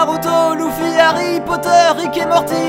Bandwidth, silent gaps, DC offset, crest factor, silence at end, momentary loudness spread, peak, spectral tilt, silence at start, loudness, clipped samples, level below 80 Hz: 16 kHz; none; under 0.1%; 14 dB; 0 s; 6 LU; 0 dBFS; -4 dB/octave; 0 s; -14 LUFS; under 0.1%; -48 dBFS